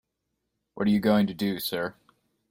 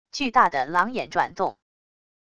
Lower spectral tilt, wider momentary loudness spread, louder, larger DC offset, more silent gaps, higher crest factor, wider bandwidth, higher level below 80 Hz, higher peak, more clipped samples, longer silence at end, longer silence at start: first, -6 dB/octave vs -4 dB/octave; about the same, 10 LU vs 8 LU; second, -26 LUFS vs -23 LUFS; neither; neither; about the same, 18 dB vs 20 dB; first, 16.5 kHz vs 11 kHz; about the same, -62 dBFS vs -60 dBFS; second, -10 dBFS vs -4 dBFS; neither; second, 0.6 s vs 0.8 s; first, 0.75 s vs 0.15 s